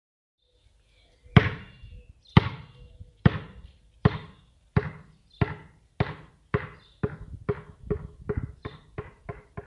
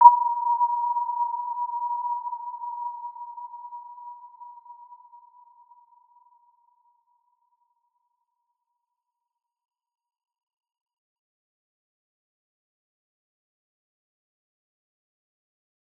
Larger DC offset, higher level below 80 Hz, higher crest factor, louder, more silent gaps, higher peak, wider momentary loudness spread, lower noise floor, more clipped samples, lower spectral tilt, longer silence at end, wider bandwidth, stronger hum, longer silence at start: neither; first, -44 dBFS vs under -90 dBFS; about the same, 28 dB vs 28 dB; about the same, -28 LUFS vs -26 LUFS; neither; about the same, -2 dBFS vs -2 dBFS; about the same, 22 LU vs 22 LU; second, -63 dBFS vs -84 dBFS; neither; first, -8.5 dB/octave vs -3 dB/octave; second, 0.05 s vs 11.05 s; first, 6.4 kHz vs 1.6 kHz; neither; first, 1.35 s vs 0 s